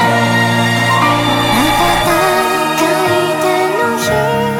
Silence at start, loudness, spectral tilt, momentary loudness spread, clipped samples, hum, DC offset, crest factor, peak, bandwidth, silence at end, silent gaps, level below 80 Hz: 0 s; -12 LUFS; -4.5 dB/octave; 2 LU; under 0.1%; none; under 0.1%; 12 dB; 0 dBFS; 18 kHz; 0 s; none; -36 dBFS